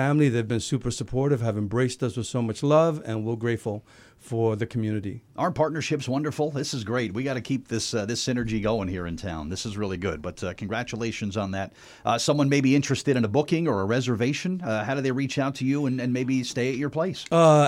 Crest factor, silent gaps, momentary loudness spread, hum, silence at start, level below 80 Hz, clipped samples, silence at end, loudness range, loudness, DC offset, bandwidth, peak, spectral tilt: 18 dB; none; 10 LU; none; 0 s; -52 dBFS; under 0.1%; 0 s; 5 LU; -26 LUFS; under 0.1%; 14 kHz; -6 dBFS; -6 dB/octave